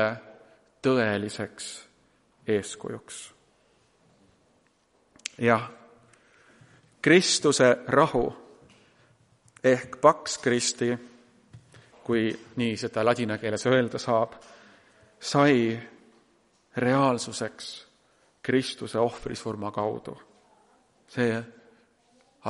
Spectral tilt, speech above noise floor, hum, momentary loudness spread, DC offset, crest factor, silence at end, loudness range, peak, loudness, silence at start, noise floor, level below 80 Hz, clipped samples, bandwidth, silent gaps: -4.5 dB/octave; 41 dB; none; 18 LU; under 0.1%; 24 dB; 0 s; 9 LU; -4 dBFS; -26 LUFS; 0 s; -67 dBFS; -60 dBFS; under 0.1%; 11.5 kHz; none